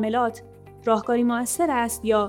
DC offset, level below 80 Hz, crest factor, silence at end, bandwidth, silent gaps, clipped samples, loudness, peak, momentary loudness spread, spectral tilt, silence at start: under 0.1%; -52 dBFS; 16 dB; 0 s; 18.5 kHz; none; under 0.1%; -23 LUFS; -8 dBFS; 7 LU; -4 dB/octave; 0 s